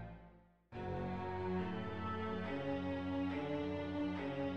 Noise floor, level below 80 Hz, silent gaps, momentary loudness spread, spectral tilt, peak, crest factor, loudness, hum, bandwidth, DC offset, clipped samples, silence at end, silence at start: -63 dBFS; -62 dBFS; none; 6 LU; -8 dB/octave; -28 dBFS; 12 dB; -41 LUFS; none; 7 kHz; under 0.1%; under 0.1%; 0 s; 0 s